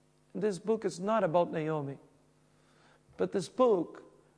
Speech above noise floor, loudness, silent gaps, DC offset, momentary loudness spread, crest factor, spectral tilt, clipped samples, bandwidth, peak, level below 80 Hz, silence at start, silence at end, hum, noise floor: 36 dB; -32 LUFS; none; under 0.1%; 14 LU; 20 dB; -6.5 dB/octave; under 0.1%; 10.5 kHz; -14 dBFS; -76 dBFS; 0.35 s; 0.35 s; none; -66 dBFS